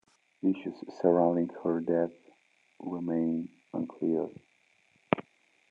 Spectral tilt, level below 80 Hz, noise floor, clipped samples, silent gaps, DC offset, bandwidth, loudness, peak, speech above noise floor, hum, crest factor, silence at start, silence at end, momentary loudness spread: -9 dB/octave; -78 dBFS; -68 dBFS; under 0.1%; none; under 0.1%; 7 kHz; -31 LUFS; -6 dBFS; 38 dB; none; 26 dB; 0.45 s; 0.5 s; 13 LU